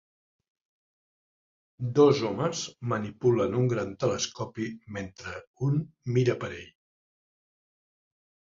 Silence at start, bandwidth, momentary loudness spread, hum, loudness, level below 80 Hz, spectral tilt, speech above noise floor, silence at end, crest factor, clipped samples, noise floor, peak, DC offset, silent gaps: 1.8 s; 7.6 kHz; 16 LU; none; -28 LUFS; -60 dBFS; -6 dB/octave; over 63 dB; 1.9 s; 22 dB; under 0.1%; under -90 dBFS; -8 dBFS; under 0.1%; 5.47-5.54 s